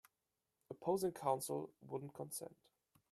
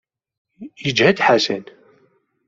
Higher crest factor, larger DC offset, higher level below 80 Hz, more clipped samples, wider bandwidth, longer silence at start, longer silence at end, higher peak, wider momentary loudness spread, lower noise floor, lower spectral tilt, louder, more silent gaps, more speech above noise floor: about the same, 22 dB vs 20 dB; neither; second, -82 dBFS vs -60 dBFS; neither; first, 15.5 kHz vs 7.8 kHz; about the same, 0.7 s vs 0.6 s; second, 0.65 s vs 0.85 s; second, -24 dBFS vs -2 dBFS; about the same, 10 LU vs 12 LU; first, -90 dBFS vs -61 dBFS; about the same, -5 dB/octave vs -4.5 dB/octave; second, -43 LUFS vs -17 LUFS; neither; first, 47 dB vs 43 dB